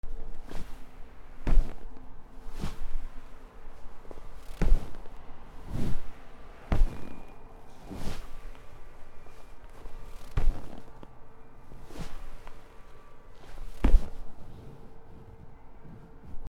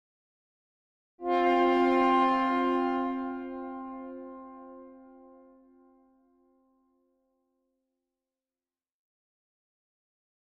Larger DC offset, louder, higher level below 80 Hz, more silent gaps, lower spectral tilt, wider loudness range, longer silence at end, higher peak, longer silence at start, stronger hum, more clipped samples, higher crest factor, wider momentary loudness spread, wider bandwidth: neither; second, -37 LUFS vs -27 LUFS; first, -32 dBFS vs -68 dBFS; neither; first, -7 dB/octave vs -5.5 dB/octave; second, 6 LU vs 20 LU; second, 0.05 s vs 5.55 s; first, -6 dBFS vs -14 dBFS; second, 0.05 s vs 1.2 s; neither; neither; about the same, 22 dB vs 18 dB; about the same, 22 LU vs 23 LU; second, 5.8 kHz vs 7.8 kHz